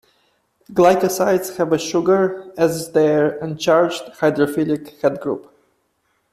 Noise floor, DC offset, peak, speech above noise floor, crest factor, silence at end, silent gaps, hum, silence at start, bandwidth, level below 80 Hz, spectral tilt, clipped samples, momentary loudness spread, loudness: -67 dBFS; under 0.1%; -2 dBFS; 49 dB; 16 dB; 0.9 s; none; none; 0.7 s; 15 kHz; -60 dBFS; -5.5 dB/octave; under 0.1%; 7 LU; -18 LUFS